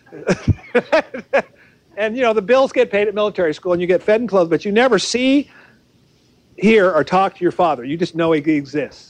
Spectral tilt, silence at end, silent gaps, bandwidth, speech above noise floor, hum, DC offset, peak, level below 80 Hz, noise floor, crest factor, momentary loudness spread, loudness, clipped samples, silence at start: -5.5 dB/octave; 0.2 s; none; 10 kHz; 39 dB; none; under 0.1%; -4 dBFS; -48 dBFS; -55 dBFS; 14 dB; 7 LU; -17 LUFS; under 0.1%; 0.1 s